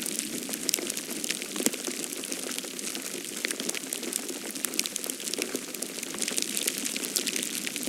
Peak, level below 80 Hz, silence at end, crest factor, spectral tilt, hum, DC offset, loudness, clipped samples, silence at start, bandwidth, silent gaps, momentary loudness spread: 0 dBFS; -78 dBFS; 0 s; 32 dB; -0.5 dB/octave; none; under 0.1%; -30 LUFS; under 0.1%; 0 s; 17 kHz; none; 5 LU